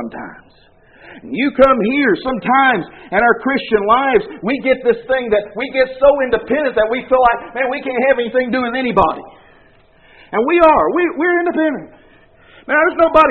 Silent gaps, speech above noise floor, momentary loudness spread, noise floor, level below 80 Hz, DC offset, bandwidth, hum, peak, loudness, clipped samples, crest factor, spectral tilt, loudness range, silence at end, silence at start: none; 34 dB; 8 LU; -49 dBFS; -44 dBFS; 0.1%; 4.6 kHz; none; 0 dBFS; -15 LUFS; under 0.1%; 16 dB; -3 dB/octave; 2 LU; 0 s; 0 s